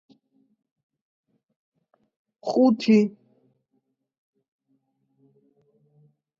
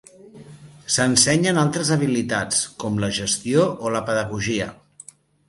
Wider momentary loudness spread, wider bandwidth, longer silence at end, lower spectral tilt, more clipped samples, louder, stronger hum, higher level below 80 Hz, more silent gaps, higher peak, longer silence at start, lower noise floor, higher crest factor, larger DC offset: about the same, 11 LU vs 9 LU; second, 7.4 kHz vs 12 kHz; first, 3.3 s vs 0.75 s; first, -7 dB/octave vs -3.5 dB/octave; neither; about the same, -21 LUFS vs -20 LUFS; neither; second, -78 dBFS vs -52 dBFS; neither; second, -8 dBFS vs -2 dBFS; first, 2.45 s vs 0.35 s; first, -74 dBFS vs -47 dBFS; about the same, 20 dB vs 20 dB; neither